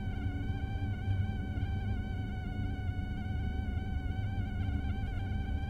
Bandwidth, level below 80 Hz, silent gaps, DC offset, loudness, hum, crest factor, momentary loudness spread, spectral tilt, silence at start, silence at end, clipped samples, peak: 6.4 kHz; -40 dBFS; none; under 0.1%; -37 LUFS; none; 12 dB; 3 LU; -8.5 dB/octave; 0 s; 0 s; under 0.1%; -22 dBFS